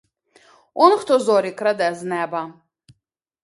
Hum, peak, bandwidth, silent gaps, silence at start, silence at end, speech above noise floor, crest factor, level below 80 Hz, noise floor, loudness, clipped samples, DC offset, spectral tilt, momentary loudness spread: none; 0 dBFS; 11.5 kHz; none; 0.75 s; 0.9 s; 59 dB; 20 dB; -72 dBFS; -77 dBFS; -19 LUFS; under 0.1%; under 0.1%; -4.5 dB/octave; 13 LU